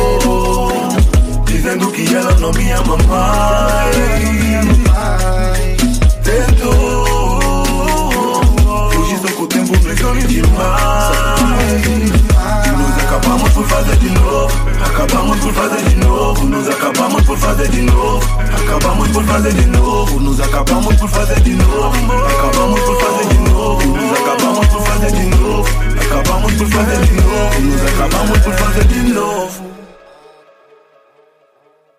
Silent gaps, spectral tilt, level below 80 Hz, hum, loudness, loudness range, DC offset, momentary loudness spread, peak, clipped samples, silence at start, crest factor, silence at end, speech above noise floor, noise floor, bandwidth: none; -5 dB/octave; -14 dBFS; none; -13 LUFS; 1 LU; under 0.1%; 4 LU; 0 dBFS; under 0.1%; 0 s; 10 dB; 2.15 s; 42 dB; -52 dBFS; 16 kHz